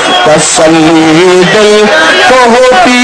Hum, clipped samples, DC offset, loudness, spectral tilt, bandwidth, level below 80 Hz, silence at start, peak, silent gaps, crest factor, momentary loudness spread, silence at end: none; 20%; under 0.1%; -3 LUFS; -3 dB/octave; 11 kHz; -36 dBFS; 0 s; 0 dBFS; none; 4 dB; 1 LU; 0 s